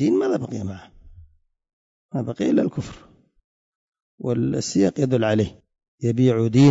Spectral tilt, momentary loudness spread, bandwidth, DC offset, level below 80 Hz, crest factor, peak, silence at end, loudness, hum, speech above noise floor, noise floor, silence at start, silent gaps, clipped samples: -7 dB/octave; 13 LU; 8 kHz; under 0.1%; -54 dBFS; 16 dB; -6 dBFS; 0 s; -22 LUFS; none; 33 dB; -53 dBFS; 0 s; 1.73-2.09 s, 3.44-3.92 s, 4.02-4.18 s, 5.88-5.98 s; under 0.1%